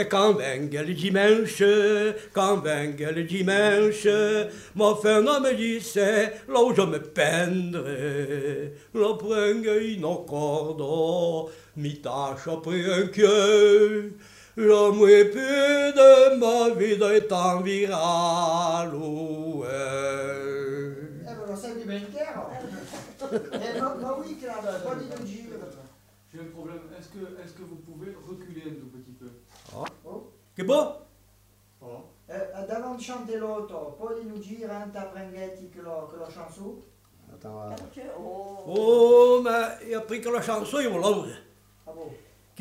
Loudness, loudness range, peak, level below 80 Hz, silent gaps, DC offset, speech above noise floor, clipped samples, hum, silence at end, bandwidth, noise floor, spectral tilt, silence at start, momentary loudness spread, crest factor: -23 LUFS; 21 LU; -4 dBFS; -64 dBFS; none; under 0.1%; 37 dB; under 0.1%; none; 0.45 s; 15 kHz; -60 dBFS; -4.5 dB/octave; 0 s; 23 LU; 20 dB